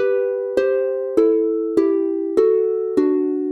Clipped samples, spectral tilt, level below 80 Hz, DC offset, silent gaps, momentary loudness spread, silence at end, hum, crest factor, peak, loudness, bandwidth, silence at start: under 0.1%; -6.5 dB/octave; -60 dBFS; under 0.1%; none; 4 LU; 0 s; none; 16 dB; -4 dBFS; -19 LUFS; 8.2 kHz; 0 s